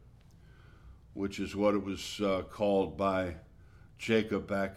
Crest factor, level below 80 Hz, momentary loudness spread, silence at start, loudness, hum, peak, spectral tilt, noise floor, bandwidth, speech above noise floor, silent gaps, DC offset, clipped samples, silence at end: 18 dB; -56 dBFS; 10 LU; 0.45 s; -32 LUFS; none; -16 dBFS; -5.5 dB/octave; -57 dBFS; 14 kHz; 25 dB; none; under 0.1%; under 0.1%; 0 s